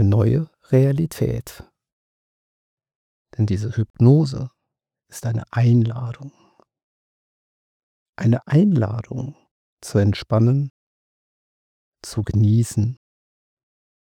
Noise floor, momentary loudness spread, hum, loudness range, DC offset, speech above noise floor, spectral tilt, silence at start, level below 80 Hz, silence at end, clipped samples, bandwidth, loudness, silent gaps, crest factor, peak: -82 dBFS; 17 LU; none; 4 LU; under 0.1%; 63 dB; -8 dB/octave; 0 s; -50 dBFS; 1.05 s; under 0.1%; 14.5 kHz; -20 LUFS; 1.92-2.77 s, 2.95-3.25 s, 3.90-3.94 s, 6.84-8.13 s, 9.51-9.77 s, 10.70-11.92 s; 20 dB; -2 dBFS